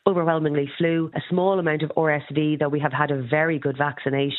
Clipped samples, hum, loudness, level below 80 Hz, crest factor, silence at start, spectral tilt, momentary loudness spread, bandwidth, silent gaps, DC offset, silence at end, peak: under 0.1%; none; -23 LUFS; -68 dBFS; 20 dB; 0.05 s; -10.5 dB/octave; 3 LU; 4.1 kHz; none; under 0.1%; 0 s; -2 dBFS